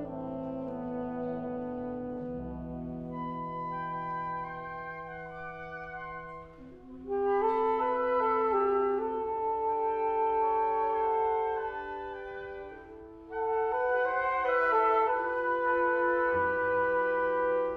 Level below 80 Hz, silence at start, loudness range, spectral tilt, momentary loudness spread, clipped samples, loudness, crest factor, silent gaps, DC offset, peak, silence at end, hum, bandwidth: -58 dBFS; 0 s; 10 LU; -8 dB/octave; 14 LU; under 0.1%; -31 LUFS; 16 dB; none; under 0.1%; -14 dBFS; 0 s; none; 5.6 kHz